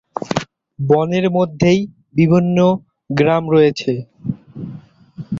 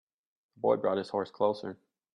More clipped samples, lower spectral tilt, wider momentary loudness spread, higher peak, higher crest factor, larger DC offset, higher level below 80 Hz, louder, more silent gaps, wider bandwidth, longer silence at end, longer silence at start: neither; about the same, -7.5 dB/octave vs -7 dB/octave; first, 17 LU vs 9 LU; first, 0 dBFS vs -14 dBFS; about the same, 16 dB vs 20 dB; neither; first, -50 dBFS vs -80 dBFS; first, -16 LUFS vs -31 LUFS; neither; second, 7.6 kHz vs 10 kHz; second, 0 s vs 0.4 s; second, 0.15 s vs 0.65 s